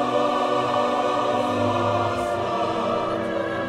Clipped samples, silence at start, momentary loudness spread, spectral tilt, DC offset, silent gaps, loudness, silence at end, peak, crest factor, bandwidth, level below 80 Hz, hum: under 0.1%; 0 s; 3 LU; -5.5 dB/octave; under 0.1%; none; -23 LUFS; 0 s; -10 dBFS; 12 dB; 13.5 kHz; -54 dBFS; none